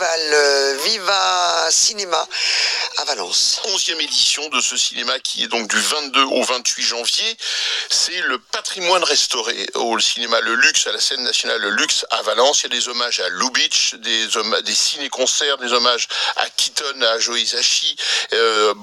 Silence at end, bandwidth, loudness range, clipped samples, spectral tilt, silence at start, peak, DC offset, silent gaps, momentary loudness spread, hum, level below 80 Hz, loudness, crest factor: 0 s; 16 kHz; 1 LU; under 0.1%; 1 dB/octave; 0 s; 0 dBFS; under 0.1%; none; 5 LU; none; -70 dBFS; -16 LUFS; 18 dB